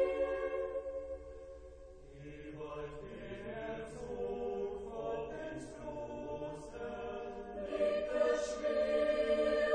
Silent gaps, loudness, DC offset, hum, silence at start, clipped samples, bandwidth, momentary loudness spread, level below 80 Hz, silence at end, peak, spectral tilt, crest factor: none; -38 LUFS; under 0.1%; none; 0 s; under 0.1%; 9.6 kHz; 17 LU; -58 dBFS; 0 s; -22 dBFS; -5 dB/octave; 16 dB